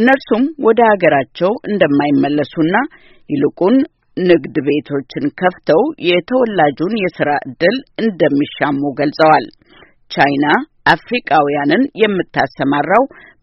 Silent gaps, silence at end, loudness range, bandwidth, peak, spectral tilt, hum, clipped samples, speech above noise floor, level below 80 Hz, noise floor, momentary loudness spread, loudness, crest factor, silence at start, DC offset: none; 0.35 s; 2 LU; 6 kHz; 0 dBFS; -4 dB/octave; none; under 0.1%; 32 dB; -52 dBFS; -46 dBFS; 7 LU; -14 LUFS; 14 dB; 0 s; under 0.1%